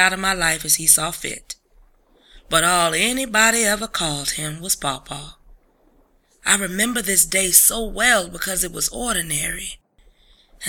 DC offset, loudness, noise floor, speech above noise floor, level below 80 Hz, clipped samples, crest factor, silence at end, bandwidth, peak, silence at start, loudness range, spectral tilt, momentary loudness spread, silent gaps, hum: under 0.1%; -18 LUFS; -58 dBFS; 38 dB; -42 dBFS; under 0.1%; 22 dB; 0 s; 19 kHz; 0 dBFS; 0 s; 5 LU; -1 dB/octave; 15 LU; none; none